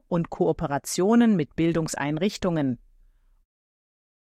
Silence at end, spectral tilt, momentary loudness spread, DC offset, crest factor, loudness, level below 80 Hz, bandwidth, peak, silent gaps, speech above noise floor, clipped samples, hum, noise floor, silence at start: 1.55 s; -6 dB/octave; 8 LU; under 0.1%; 16 dB; -24 LUFS; -52 dBFS; 14.5 kHz; -10 dBFS; none; 35 dB; under 0.1%; none; -58 dBFS; 0.1 s